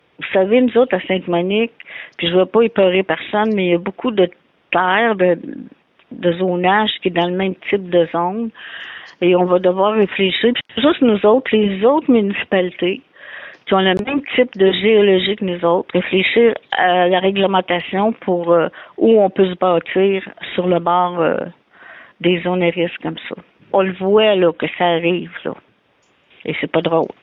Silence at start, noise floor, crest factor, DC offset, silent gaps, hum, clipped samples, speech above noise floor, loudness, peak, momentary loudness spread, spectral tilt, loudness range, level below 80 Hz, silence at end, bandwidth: 0.2 s; -58 dBFS; 14 dB; under 0.1%; none; none; under 0.1%; 43 dB; -16 LUFS; -2 dBFS; 12 LU; -8.5 dB/octave; 3 LU; -56 dBFS; 0.15 s; 4.1 kHz